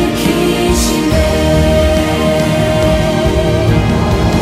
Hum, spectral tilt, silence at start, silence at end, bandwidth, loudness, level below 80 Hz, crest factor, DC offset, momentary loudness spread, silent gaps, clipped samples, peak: none; -5.5 dB/octave; 0 s; 0 s; 16 kHz; -12 LUFS; -20 dBFS; 10 dB; under 0.1%; 2 LU; none; under 0.1%; 0 dBFS